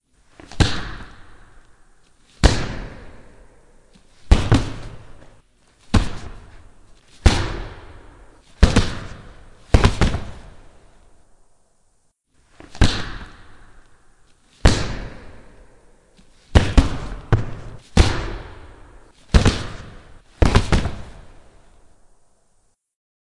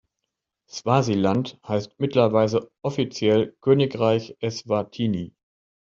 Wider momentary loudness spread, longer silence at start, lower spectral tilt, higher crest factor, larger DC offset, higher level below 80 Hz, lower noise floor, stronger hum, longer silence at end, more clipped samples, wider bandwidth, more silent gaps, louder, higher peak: first, 24 LU vs 10 LU; second, 0.55 s vs 0.75 s; about the same, -5.5 dB/octave vs -6.5 dB/octave; about the same, 22 dB vs 20 dB; neither; first, -26 dBFS vs -62 dBFS; second, -61 dBFS vs -82 dBFS; neither; first, 2 s vs 0.55 s; neither; first, 11.5 kHz vs 7.6 kHz; neither; about the same, -21 LUFS vs -23 LUFS; first, 0 dBFS vs -4 dBFS